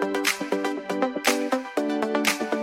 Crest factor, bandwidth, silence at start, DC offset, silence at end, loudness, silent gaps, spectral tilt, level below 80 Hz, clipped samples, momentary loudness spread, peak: 20 dB; 16.5 kHz; 0 s; under 0.1%; 0 s; -25 LUFS; none; -2.5 dB/octave; -70 dBFS; under 0.1%; 4 LU; -6 dBFS